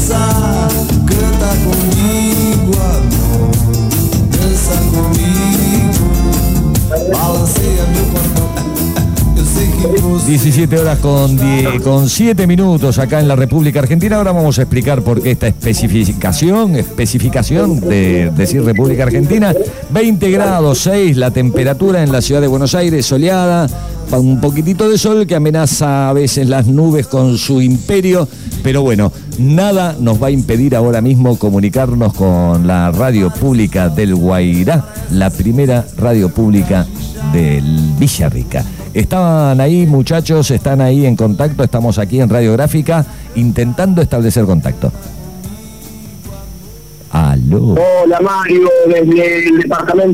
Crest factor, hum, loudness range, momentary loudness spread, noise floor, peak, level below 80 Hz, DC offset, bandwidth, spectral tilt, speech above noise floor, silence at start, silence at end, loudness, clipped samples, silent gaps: 10 dB; none; 2 LU; 5 LU; -32 dBFS; -2 dBFS; -22 dBFS; 0.9%; 16.5 kHz; -6 dB/octave; 22 dB; 0 s; 0 s; -11 LUFS; under 0.1%; none